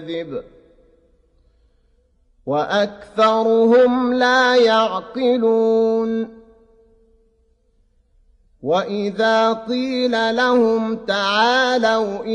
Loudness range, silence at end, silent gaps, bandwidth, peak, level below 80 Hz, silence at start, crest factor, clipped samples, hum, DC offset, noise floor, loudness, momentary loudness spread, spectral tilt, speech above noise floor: 9 LU; 0 s; none; 9.4 kHz; -4 dBFS; -58 dBFS; 0 s; 16 dB; under 0.1%; none; under 0.1%; -60 dBFS; -17 LUFS; 10 LU; -4.5 dB/octave; 43 dB